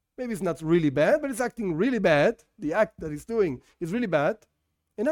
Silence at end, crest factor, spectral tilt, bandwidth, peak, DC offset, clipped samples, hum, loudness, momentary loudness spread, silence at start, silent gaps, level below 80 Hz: 0 s; 18 dB; -6.5 dB/octave; 17.5 kHz; -8 dBFS; under 0.1%; under 0.1%; none; -26 LUFS; 13 LU; 0.2 s; none; -56 dBFS